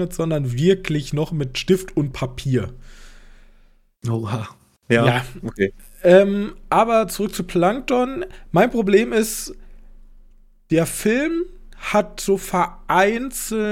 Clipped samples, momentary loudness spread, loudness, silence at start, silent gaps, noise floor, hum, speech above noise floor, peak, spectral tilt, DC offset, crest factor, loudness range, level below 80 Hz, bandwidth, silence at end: under 0.1%; 10 LU; -20 LUFS; 0 s; none; -53 dBFS; none; 33 dB; -2 dBFS; -5.5 dB/octave; under 0.1%; 18 dB; 6 LU; -42 dBFS; 17 kHz; 0 s